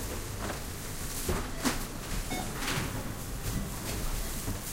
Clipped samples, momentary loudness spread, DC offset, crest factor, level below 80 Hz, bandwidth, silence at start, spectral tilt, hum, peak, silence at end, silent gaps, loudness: under 0.1%; 5 LU; under 0.1%; 20 dB; -38 dBFS; 16 kHz; 0 s; -3.5 dB/octave; none; -14 dBFS; 0 s; none; -35 LUFS